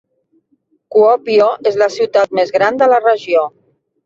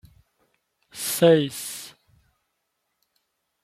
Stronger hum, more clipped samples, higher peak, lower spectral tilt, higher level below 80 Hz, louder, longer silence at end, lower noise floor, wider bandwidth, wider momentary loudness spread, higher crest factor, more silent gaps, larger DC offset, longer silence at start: neither; neither; first, -2 dBFS vs -6 dBFS; about the same, -4.5 dB/octave vs -4.5 dB/octave; about the same, -62 dBFS vs -66 dBFS; first, -13 LUFS vs -22 LUFS; second, 0.55 s vs 1.75 s; second, -61 dBFS vs -77 dBFS; second, 7.6 kHz vs 16 kHz; second, 5 LU vs 24 LU; second, 12 dB vs 22 dB; neither; neither; about the same, 0.9 s vs 0.95 s